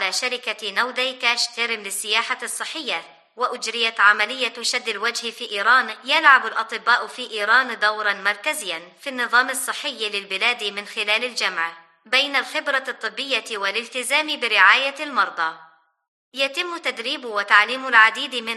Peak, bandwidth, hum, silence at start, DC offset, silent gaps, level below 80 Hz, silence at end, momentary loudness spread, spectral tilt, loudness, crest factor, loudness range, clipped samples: 0 dBFS; 12.5 kHz; none; 0 s; under 0.1%; 16.08-16.32 s; under -90 dBFS; 0 s; 12 LU; 0.5 dB/octave; -20 LUFS; 22 dB; 4 LU; under 0.1%